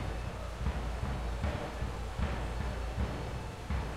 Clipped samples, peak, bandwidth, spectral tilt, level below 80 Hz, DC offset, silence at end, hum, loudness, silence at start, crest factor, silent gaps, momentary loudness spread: under 0.1%; -22 dBFS; 13.5 kHz; -6 dB/octave; -38 dBFS; under 0.1%; 0 s; none; -38 LUFS; 0 s; 14 dB; none; 3 LU